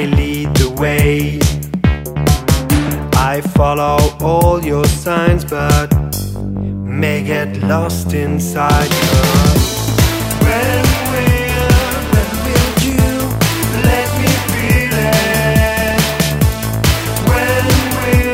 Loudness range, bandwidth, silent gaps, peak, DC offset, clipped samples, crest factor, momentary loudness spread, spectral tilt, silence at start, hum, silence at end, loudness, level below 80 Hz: 3 LU; 16.5 kHz; none; 0 dBFS; under 0.1%; under 0.1%; 12 dB; 4 LU; -5 dB/octave; 0 s; none; 0 s; -14 LUFS; -22 dBFS